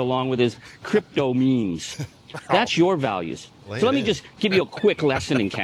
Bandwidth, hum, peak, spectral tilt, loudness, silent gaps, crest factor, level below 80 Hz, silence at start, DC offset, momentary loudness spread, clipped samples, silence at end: 12.5 kHz; none; -4 dBFS; -5.5 dB/octave; -22 LUFS; none; 20 dB; -58 dBFS; 0 s; under 0.1%; 14 LU; under 0.1%; 0 s